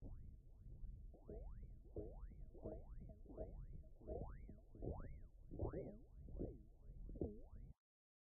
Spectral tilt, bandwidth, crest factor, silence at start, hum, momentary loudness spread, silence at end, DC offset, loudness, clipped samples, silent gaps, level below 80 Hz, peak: -9.5 dB/octave; 2.4 kHz; 22 dB; 0 s; none; 12 LU; 0.5 s; under 0.1%; -56 LUFS; under 0.1%; none; -56 dBFS; -32 dBFS